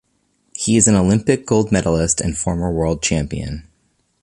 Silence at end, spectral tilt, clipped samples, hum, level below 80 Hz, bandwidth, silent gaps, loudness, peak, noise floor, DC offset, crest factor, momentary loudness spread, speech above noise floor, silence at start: 0.6 s; -5 dB/octave; under 0.1%; none; -34 dBFS; 11.5 kHz; none; -17 LUFS; 0 dBFS; -64 dBFS; under 0.1%; 18 dB; 14 LU; 48 dB; 0.55 s